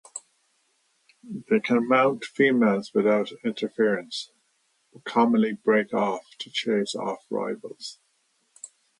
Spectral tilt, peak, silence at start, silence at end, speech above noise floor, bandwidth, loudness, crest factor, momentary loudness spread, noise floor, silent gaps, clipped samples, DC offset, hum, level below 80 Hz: -5 dB/octave; -6 dBFS; 0.15 s; 0.35 s; 46 dB; 11 kHz; -24 LUFS; 20 dB; 19 LU; -70 dBFS; none; under 0.1%; under 0.1%; none; -76 dBFS